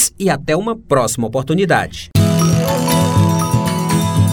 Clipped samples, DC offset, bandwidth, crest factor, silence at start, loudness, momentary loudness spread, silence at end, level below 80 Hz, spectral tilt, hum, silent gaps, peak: under 0.1%; under 0.1%; over 20 kHz; 14 dB; 0 s; -15 LUFS; 5 LU; 0 s; -38 dBFS; -5 dB/octave; none; none; 0 dBFS